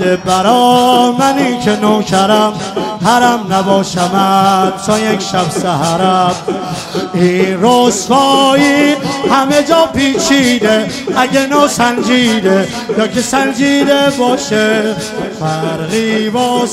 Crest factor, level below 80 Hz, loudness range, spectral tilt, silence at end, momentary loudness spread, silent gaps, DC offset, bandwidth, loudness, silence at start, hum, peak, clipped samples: 10 dB; -46 dBFS; 3 LU; -4 dB/octave; 0 s; 7 LU; none; under 0.1%; 16 kHz; -11 LUFS; 0 s; none; 0 dBFS; 0.3%